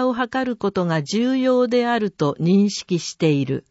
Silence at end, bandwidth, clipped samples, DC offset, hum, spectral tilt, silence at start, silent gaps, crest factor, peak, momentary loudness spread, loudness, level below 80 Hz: 0.1 s; 8 kHz; under 0.1%; under 0.1%; none; -6 dB/octave; 0 s; none; 14 dB; -6 dBFS; 5 LU; -20 LUFS; -60 dBFS